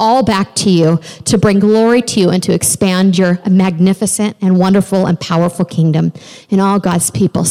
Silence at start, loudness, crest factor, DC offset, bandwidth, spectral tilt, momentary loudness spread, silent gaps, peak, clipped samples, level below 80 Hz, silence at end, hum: 0 s; -12 LUFS; 10 dB; under 0.1%; 15.5 kHz; -5.5 dB/octave; 4 LU; none; -2 dBFS; under 0.1%; -44 dBFS; 0 s; none